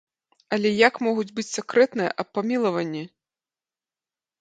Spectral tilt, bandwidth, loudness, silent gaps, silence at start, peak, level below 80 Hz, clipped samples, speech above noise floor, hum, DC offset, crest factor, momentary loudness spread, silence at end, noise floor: -4.5 dB/octave; 9.4 kHz; -23 LUFS; none; 0.5 s; -4 dBFS; -74 dBFS; under 0.1%; over 67 dB; none; under 0.1%; 22 dB; 11 LU; 1.35 s; under -90 dBFS